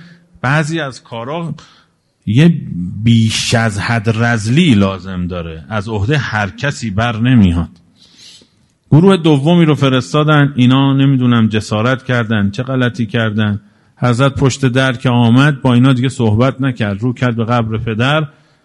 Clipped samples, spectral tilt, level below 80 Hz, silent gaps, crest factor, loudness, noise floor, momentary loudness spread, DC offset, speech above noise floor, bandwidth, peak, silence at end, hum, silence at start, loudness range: under 0.1%; -6.5 dB/octave; -40 dBFS; none; 12 dB; -13 LUFS; -52 dBFS; 11 LU; under 0.1%; 39 dB; 12 kHz; 0 dBFS; 0.35 s; none; 0.45 s; 4 LU